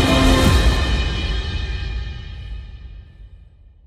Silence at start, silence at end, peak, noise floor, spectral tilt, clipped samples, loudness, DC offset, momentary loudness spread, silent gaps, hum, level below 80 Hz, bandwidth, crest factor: 0 s; 0.5 s; -2 dBFS; -46 dBFS; -5 dB/octave; under 0.1%; -19 LUFS; under 0.1%; 22 LU; none; none; -22 dBFS; 15.5 kHz; 18 dB